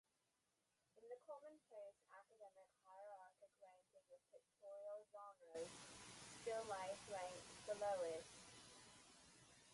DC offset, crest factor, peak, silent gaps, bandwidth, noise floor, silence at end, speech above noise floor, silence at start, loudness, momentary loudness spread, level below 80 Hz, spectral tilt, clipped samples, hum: under 0.1%; 20 dB; -36 dBFS; none; 11.5 kHz; -88 dBFS; 0 s; 39 dB; 0.95 s; -54 LUFS; 19 LU; -86 dBFS; -2.5 dB/octave; under 0.1%; 60 Hz at -90 dBFS